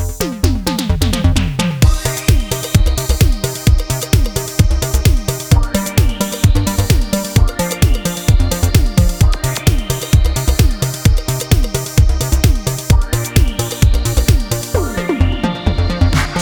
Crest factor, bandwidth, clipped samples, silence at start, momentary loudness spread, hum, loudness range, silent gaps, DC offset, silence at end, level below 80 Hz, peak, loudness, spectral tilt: 12 dB; over 20 kHz; under 0.1%; 0 s; 3 LU; none; 1 LU; none; under 0.1%; 0 s; -16 dBFS; 0 dBFS; -15 LUFS; -5 dB/octave